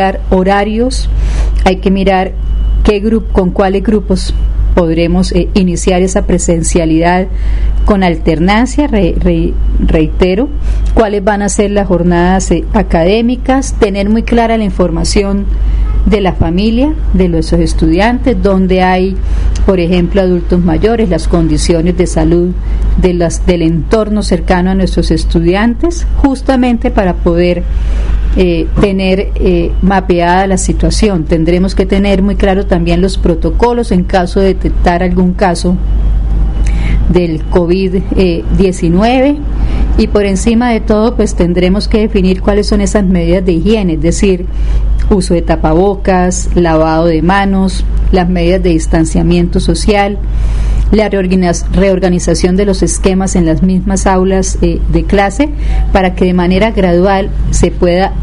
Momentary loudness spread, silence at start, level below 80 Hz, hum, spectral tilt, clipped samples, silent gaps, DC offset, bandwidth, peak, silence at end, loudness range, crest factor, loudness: 4 LU; 0 s; -14 dBFS; none; -6 dB/octave; under 0.1%; none; 0.2%; 11 kHz; 0 dBFS; 0 s; 1 LU; 8 dB; -11 LUFS